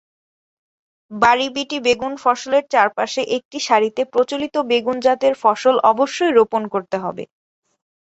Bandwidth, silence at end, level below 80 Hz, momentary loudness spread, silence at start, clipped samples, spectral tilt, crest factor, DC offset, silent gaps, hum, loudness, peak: 8.2 kHz; 0.85 s; -60 dBFS; 8 LU; 1.1 s; under 0.1%; -3.5 dB/octave; 18 dB; under 0.1%; 3.45-3.51 s; none; -18 LUFS; -2 dBFS